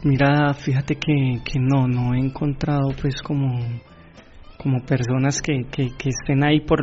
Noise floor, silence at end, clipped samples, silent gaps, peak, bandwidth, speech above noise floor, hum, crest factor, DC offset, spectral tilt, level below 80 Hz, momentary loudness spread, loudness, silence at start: -44 dBFS; 0 s; under 0.1%; none; -4 dBFS; 7.8 kHz; 24 dB; none; 16 dB; under 0.1%; -6.5 dB/octave; -40 dBFS; 8 LU; -21 LUFS; 0 s